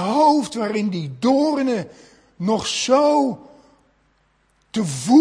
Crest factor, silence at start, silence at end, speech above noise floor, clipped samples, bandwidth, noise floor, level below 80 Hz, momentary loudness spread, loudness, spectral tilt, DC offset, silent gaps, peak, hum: 18 dB; 0 s; 0 s; 44 dB; under 0.1%; 10.5 kHz; -62 dBFS; -60 dBFS; 11 LU; -20 LUFS; -5 dB/octave; under 0.1%; none; -2 dBFS; none